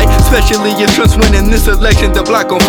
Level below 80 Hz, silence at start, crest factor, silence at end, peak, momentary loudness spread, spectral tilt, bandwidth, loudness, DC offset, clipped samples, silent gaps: -12 dBFS; 0 s; 8 dB; 0 s; 0 dBFS; 3 LU; -4.5 dB/octave; over 20 kHz; -10 LUFS; under 0.1%; under 0.1%; none